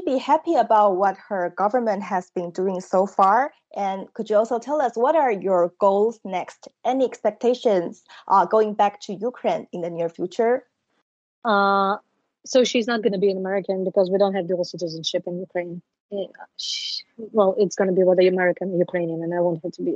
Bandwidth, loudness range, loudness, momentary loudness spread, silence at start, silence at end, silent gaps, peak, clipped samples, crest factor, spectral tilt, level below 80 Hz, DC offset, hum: 8.2 kHz; 3 LU; -22 LUFS; 12 LU; 0 s; 0 s; 11.02-11.42 s, 16.00-16.09 s; -4 dBFS; under 0.1%; 16 dB; -5 dB/octave; -76 dBFS; under 0.1%; none